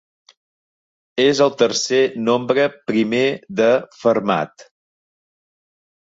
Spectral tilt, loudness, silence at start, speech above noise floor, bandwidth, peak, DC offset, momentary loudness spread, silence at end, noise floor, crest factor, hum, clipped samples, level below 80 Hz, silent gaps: -4 dB/octave; -18 LUFS; 1.15 s; over 73 dB; 8 kHz; -2 dBFS; under 0.1%; 5 LU; 1.5 s; under -90 dBFS; 18 dB; none; under 0.1%; -64 dBFS; none